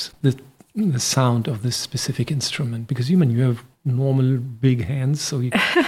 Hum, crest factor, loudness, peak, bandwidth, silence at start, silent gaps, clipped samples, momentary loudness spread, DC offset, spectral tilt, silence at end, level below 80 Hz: none; 16 dB; -21 LUFS; -4 dBFS; 14.5 kHz; 0 s; none; under 0.1%; 7 LU; under 0.1%; -5 dB/octave; 0 s; -54 dBFS